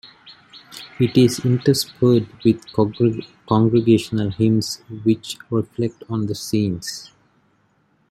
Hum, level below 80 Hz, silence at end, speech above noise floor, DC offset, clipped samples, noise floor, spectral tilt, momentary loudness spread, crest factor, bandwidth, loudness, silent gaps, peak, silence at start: none; -54 dBFS; 1.05 s; 43 dB; under 0.1%; under 0.1%; -62 dBFS; -6.5 dB/octave; 12 LU; 18 dB; 14.5 kHz; -20 LUFS; none; -2 dBFS; 0.05 s